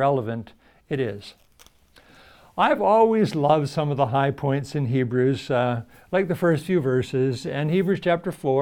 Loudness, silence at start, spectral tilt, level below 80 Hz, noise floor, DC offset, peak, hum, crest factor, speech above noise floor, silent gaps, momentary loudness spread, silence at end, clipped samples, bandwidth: -23 LUFS; 0 s; -7.5 dB/octave; -58 dBFS; -55 dBFS; under 0.1%; -6 dBFS; none; 18 dB; 33 dB; none; 9 LU; 0 s; under 0.1%; 15.5 kHz